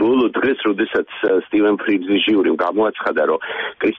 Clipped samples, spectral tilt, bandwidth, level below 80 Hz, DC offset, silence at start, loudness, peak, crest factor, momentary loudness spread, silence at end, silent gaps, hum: under 0.1%; -7 dB/octave; 4.5 kHz; -58 dBFS; under 0.1%; 0 s; -18 LUFS; -8 dBFS; 10 dB; 4 LU; 0 s; none; none